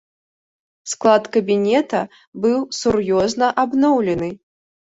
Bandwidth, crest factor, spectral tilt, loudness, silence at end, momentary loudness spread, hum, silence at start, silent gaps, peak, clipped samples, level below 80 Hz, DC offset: 8 kHz; 18 dB; -5 dB/octave; -18 LUFS; 0.5 s; 10 LU; none; 0.85 s; 2.27-2.33 s; -2 dBFS; under 0.1%; -52 dBFS; under 0.1%